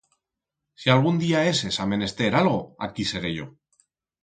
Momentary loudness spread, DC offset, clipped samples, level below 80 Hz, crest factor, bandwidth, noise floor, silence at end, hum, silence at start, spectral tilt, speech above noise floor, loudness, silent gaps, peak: 11 LU; under 0.1%; under 0.1%; -54 dBFS; 22 dB; 9.4 kHz; -85 dBFS; 0.75 s; none; 0.8 s; -5.5 dB/octave; 62 dB; -23 LUFS; none; -2 dBFS